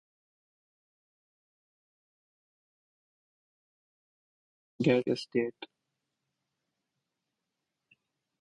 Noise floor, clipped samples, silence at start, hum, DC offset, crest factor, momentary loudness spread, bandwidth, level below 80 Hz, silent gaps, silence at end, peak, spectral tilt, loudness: -86 dBFS; under 0.1%; 4.8 s; none; under 0.1%; 26 dB; 21 LU; 10 kHz; -78 dBFS; none; 2.75 s; -12 dBFS; -7 dB/octave; -30 LUFS